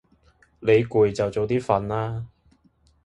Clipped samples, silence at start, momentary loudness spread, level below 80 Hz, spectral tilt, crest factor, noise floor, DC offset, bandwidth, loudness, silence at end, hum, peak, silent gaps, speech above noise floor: under 0.1%; 0.6 s; 12 LU; -50 dBFS; -7.5 dB/octave; 18 dB; -61 dBFS; under 0.1%; 9.2 kHz; -23 LUFS; 0.8 s; none; -6 dBFS; none; 39 dB